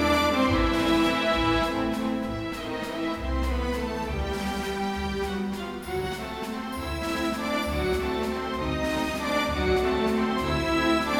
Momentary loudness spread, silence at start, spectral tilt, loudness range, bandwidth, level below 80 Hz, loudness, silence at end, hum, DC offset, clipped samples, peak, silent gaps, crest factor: 9 LU; 0 s; -5 dB/octave; 5 LU; 18 kHz; -36 dBFS; -27 LUFS; 0 s; none; under 0.1%; under 0.1%; -10 dBFS; none; 16 dB